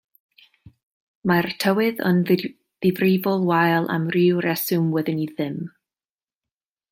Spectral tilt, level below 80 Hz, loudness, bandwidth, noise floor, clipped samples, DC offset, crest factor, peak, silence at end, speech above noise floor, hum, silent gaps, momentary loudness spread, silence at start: -6.5 dB/octave; -64 dBFS; -21 LUFS; 17 kHz; under -90 dBFS; under 0.1%; under 0.1%; 18 dB; -4 dBFS; 1.25 s; over 70 dB; none; none; 9 LU; 1.25 s